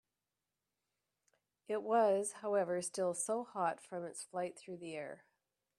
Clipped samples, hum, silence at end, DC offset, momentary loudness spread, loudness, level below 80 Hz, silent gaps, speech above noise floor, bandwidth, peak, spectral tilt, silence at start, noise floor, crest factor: under 0.1%; none; 0.6 s; under 0.1%; 14 LU; -38 LUFS; -88 dBFS; none; over 53 dB; 14 kHz; -20 dBFS; -4 dB/octave; 1.7 s; under -90 dBFS; 20 dB